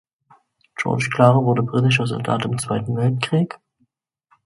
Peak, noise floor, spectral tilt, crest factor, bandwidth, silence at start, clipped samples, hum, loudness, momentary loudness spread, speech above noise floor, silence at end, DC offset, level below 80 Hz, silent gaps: 0 dBFS; -68 dBFS; -6.5 dB/octave; 20 dB; 11.5 kHz; 0.8 s; under 0.1%; none; -19 LUFS; 12 LU; 49 dB; 0.9 s; under 0.1%; -56 dBFS; none